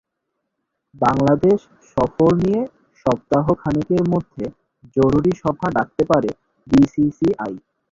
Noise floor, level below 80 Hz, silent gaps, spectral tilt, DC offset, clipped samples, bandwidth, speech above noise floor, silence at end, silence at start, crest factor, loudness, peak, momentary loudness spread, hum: -77 dBFS; -44 dBFS; none; -8.5 dB/octave; under 0.1%; under 0.1%; 7.6 kHz; 59 dB; 0.35 s; 1 s; 16 dB; -19 LUFS; -2 dBFS; 12 LU; none